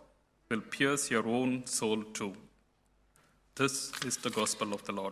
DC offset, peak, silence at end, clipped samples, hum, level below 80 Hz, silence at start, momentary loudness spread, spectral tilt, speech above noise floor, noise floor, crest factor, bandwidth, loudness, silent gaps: under 0.1%; -14 dBFS; 0 s; under 0.1%; none; -70 dBFS; 0 s; 9 LU; -3 dB/octave; 37 dB; -70 dBFS; 22 dB; 15 kHz; -33 LUFS; none